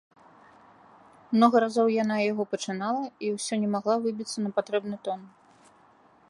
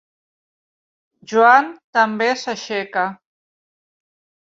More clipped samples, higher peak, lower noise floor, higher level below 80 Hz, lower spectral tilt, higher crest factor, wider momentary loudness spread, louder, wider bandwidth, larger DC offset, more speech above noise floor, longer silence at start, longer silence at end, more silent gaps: neither; second, -6 dBFS vs -2 dBFS; second, -59 dBFS vs under -90 dBFS; about the same, -74 dBFS vs -72 dBFS; first, -5 dB/octave vs -3.5 dB/octave; about the same, 22 dB vs 20 dB; about the same, 11 LU vs 12 LU; second, -27 LUFS vs -17 LUFS; first, 11.5 kHz vs 7.8 kHz; neither; second, 33 dB vs over 73 dB; about the same, 1.3 s vs 1.3 s; second, 1 s vs 1.45 s; second, none vs 1.84-1.93 s